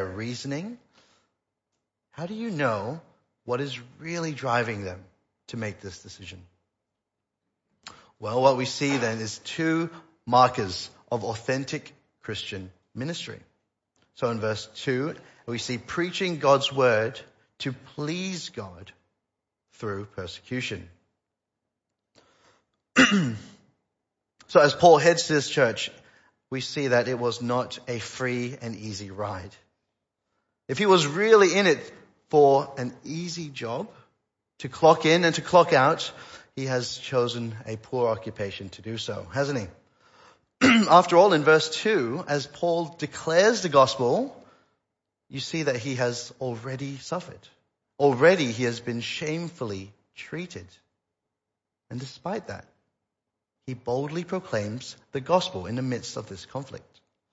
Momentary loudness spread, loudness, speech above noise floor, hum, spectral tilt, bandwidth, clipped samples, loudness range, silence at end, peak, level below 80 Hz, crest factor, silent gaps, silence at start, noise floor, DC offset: 20 LU; -25 LUFS; 61 dB; none; -4.5 dB/octave; 8 kHz; under 0.1%; 14 LU; 0.55 s; -4 dBFS; -66 dBFS; 24 dB; none; 0 s; -86 dBFS; under 0.1%